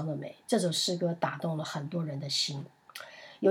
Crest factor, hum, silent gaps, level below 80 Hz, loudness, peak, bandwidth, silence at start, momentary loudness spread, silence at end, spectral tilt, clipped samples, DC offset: 18 dB; none; none; -82 dBFS; -31 LUFS; -14 dBFS; 16.5 kHz; 0 s; 17 LU; 0 s; -4.5 dB/octave; under 0.1%; under 0.1%